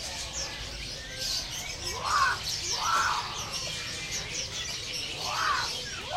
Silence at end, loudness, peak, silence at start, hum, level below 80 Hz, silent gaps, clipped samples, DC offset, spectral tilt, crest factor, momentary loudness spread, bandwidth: 0 s; -30 LUFS; -14 dBFS; 0 s; none; -50 dBFS; none; under 0.1%; under 0.1%; -0.5 dB/octave; 18 dB; 8 LU; 16 kHz